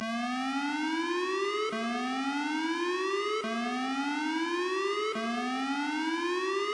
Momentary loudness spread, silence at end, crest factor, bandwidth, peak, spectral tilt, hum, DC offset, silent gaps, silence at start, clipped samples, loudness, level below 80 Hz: 2 LU; 0 s; 12 dB; 11 kHz; -18 dBFS; -3 dB/octave; none; under 0.1%; none; 0 s; under 0.1%; -31 LUFS; -78 dBFS